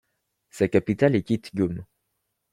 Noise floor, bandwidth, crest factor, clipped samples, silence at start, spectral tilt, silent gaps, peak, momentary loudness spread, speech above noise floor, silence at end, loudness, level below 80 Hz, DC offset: -77 dBFS; 15 kHz; 20 dB; under 0.1%; 0.55 s; -7.5 dB/octave; none; -6 dBFS; 7 LU; 54 dB; 0.7 s; -24 LUFS; -58 dBFS; under 0.1%